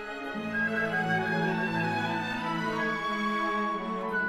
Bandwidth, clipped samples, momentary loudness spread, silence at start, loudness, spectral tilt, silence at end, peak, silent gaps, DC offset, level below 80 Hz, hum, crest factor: 15 kHz; under 0.1%; 4 LU; 0 s; -29 LUFS; -6 dB/octave; 0 s; -16 dBFS; none; under 0.1%; -60 dBFS; none; 12 dB